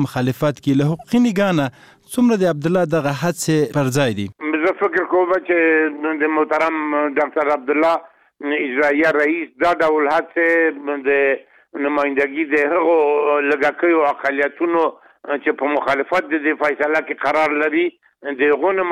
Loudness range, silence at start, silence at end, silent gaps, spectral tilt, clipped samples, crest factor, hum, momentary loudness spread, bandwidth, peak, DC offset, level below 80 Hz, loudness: 2 LU; 0 s; 0 s; none; -6 dB/octave; under 0.1%; 14 dB; none; 6 LU; 15.5 kHz; -4 dBFS; under 0.1%; -58 dBFS; -18 LUFS